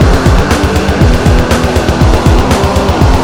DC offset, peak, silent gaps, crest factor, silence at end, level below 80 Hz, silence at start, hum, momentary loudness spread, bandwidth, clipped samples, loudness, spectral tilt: 2%; 0 dBFS; none; 8 dB; 0 s; -12 dBFS; 0 s; none; 2 LU; 18 kHz; 1%; -9 LUFS; -6 dB/octave